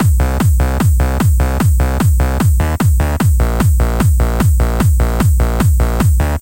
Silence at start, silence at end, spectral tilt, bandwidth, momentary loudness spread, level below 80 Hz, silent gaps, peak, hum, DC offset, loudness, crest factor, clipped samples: 0 s; 0 s; -6.5 dB/octave; 17.5 kHz; 0 LU; -14 dBFS; none; -2 dBFS; none; under 0.1%; -14 LUFS; 10 dB; under 0.1%